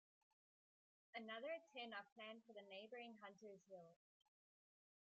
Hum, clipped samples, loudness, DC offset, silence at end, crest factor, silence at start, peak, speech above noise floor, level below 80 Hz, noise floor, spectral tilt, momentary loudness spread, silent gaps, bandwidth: none; under 0.1%; -57 LUFS; under 0.1%; 1.1 s; 20 dB; 1.15 s; -40 dBFS; over 33 dB; under -90 dBFS; under -90 dBFS; -1 dB/octave; 11 LU; 2.12-2.16 s; 7.4 kHz